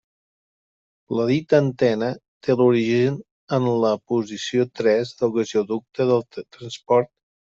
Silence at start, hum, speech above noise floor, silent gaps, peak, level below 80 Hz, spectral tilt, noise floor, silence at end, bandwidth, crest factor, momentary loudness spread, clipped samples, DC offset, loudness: 1.1 s; none; over 69 dB; 2.28-2.40 s, 3.31-3.48 s; -4 dBFS; -64 dBFS; -6.5 dB/octave; under -90 dBFS; 0.45 s; 7.6 kHz; 18 dB; 11 LU; under 0.1%; under 0.1%; -21 LUFS